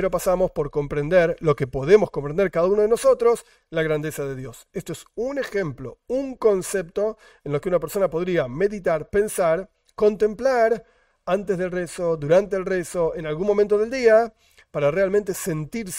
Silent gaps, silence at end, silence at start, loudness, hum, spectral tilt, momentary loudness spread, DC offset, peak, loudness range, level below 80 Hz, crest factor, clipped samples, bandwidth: none; 0 s; 0 s; -22 LUFS; none; -5.5 dB/octave; 12 LU; under 0.1%; -2 dBFS; 6 LU; -48 dBFS; 20 dB; under 0.1%; 16 kHz